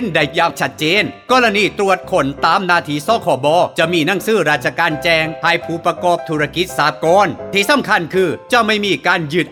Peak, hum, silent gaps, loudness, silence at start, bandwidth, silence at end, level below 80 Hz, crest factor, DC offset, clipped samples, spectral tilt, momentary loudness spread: 0 dBFS; none; none; -15 LUFS; 0 s; 19 kHz; 0 s; -48 dBFS; 14 dB; under 0.1%; under 0.1%; -4.5 dB/octave; 4 LU